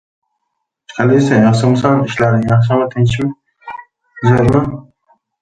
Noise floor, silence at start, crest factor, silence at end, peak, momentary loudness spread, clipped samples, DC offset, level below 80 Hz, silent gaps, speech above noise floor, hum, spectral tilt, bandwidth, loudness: -73 dBFS; 0.9 s; 14 dB; 0.6 s; 0 dBFS; 20 LU; under 0.1%; under 0.1%; -40 dBFS; none; 61 dB; none; -7.5 dB/octave; 9 kHz; -13 LUFS